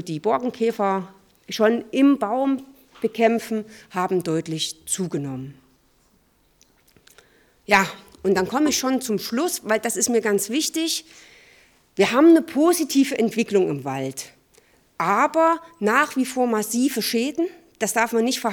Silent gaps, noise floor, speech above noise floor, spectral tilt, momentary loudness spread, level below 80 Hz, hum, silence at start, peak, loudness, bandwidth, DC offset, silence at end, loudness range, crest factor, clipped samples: none; -61 dBFS; 40 dB; -4 dB/octave; 11 LU; -64 dBFS; none; 0 s; -4 dBFS; -21 LUFS; 19 kHz; under 0.1%; 0 s; 7 LU; 20 dB; under 0.1%